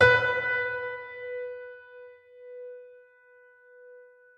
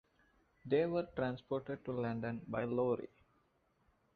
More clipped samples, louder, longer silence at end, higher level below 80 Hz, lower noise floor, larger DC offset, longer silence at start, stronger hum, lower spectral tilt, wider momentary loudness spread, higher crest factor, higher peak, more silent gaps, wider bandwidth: neither; first, -28 LUFS vs -38 LUFS; second, 0.35 s vs 1.1 s; first, -64 dBFS vs -70 dBFS; second, -57 dBFS vs -76 dBFS; neither; second, 0 s vs 0.65 s; neither; second, -4.5 dB/octave vs -6.5 dB/octave; first, 26 LU vs 8 LU; about the same, 24 dB vs 20 dB; first, -6 dBFS vs -20 dBFS; neither; first, 8.6 kHz vs 4.9 kHz